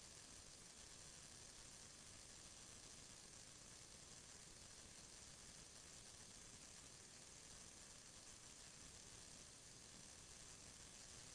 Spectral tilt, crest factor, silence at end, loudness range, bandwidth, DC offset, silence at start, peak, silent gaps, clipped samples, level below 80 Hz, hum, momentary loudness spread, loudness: -1.5 dB/octave; 14 dB; 0 s; 0 LU; 11 kHz; under 0.1%; 0 s; -46 dBFS; none; under 0.1%; -74 dBFS; none; 1 LU; -59 LUFS